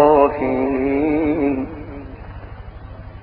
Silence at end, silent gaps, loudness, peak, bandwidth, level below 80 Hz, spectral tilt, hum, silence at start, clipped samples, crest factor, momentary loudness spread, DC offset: 0 s; none; -18 LUFS; -2 dBFS; 4.9 kHz; -38 dBFS; -7 dB/octave; none; 0 s; under 0.1%; 18 dB; 21 LU; under 0.1%